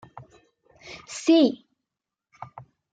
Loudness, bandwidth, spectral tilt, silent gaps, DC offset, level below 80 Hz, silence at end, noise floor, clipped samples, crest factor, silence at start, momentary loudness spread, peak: -21 LUFS; 9.2 kHz; -4 dB/octave; none; under 0.1%; -72 dBFS; 1.35 s; -87 dBFS; under 0.1%; 18 dB; 0.9 s; 25 LU; -8 dBFS